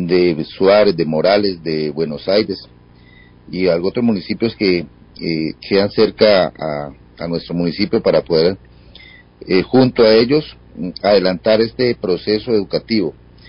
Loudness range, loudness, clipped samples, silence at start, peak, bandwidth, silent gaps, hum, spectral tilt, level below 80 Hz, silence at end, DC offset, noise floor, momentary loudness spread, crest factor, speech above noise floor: 4 LU; -16 LUFS; under 0.1%; 0 s; 0 dBFS; 5.4 kHz; none; 60 Hz at -45 dBFS; -10.5 dB/octave; -46 dBFS; 0.35 s; under 0.1%; -44 dBFS; 13 LU; 16 dB; 29 dB